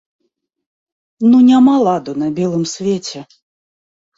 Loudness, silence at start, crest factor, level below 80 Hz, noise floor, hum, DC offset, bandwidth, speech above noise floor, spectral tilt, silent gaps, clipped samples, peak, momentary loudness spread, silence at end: -13 LUFS; 1.2 s; 12 dB; -60 dBFS; under -90 dBFS; none; under 0.1%; 7.8 kHz; over 77 dB; -6 dB/octave; none; under 0.1%; -2 dBFS; 13 LU; 0.95 s